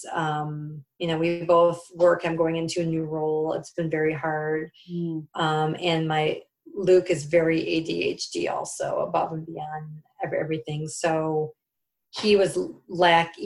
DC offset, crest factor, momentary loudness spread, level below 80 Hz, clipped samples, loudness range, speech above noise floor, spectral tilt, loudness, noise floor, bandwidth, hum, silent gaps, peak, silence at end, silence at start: under 0.1%; 20 dB; 14 LU; -62 dBFS; under 0.1%; 5 LU; 57 dB; -5.5 dB/octave; -25 LUFS; -82 dBFS; 12 kHz; none; none; -6 dBFS; 0 s; 0 s